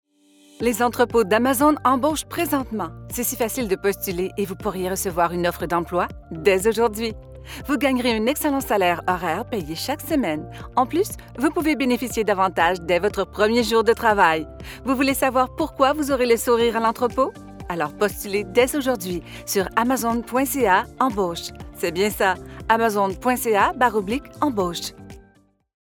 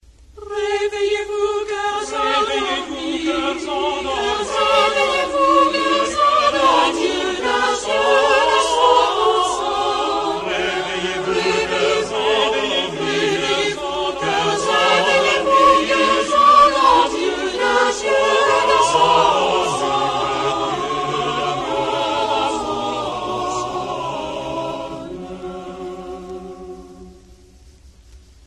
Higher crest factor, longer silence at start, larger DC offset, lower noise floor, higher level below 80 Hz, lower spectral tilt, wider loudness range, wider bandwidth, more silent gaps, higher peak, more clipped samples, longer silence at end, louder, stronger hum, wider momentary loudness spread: about the same, 18 dB vs 16 dB; first, 0.6 s vs 0.35 s; neither; first, -57 dBFS vs -46 dBFS; about the same, -44 dBFS vs -46 dBFS; about the same, -4 dB/octave vs -3 dB/octave; second, 4 LU vs 11 LU; first, over 20 kHz vs 12.5 kHz; neither; about the same, -4 dBFS vs -2 dBFS; neither; first, 0.7 s vs 0.3 s; second, -21 LUFS vs -17 LUFS; neither; about the same, 9 LU vs 11 LU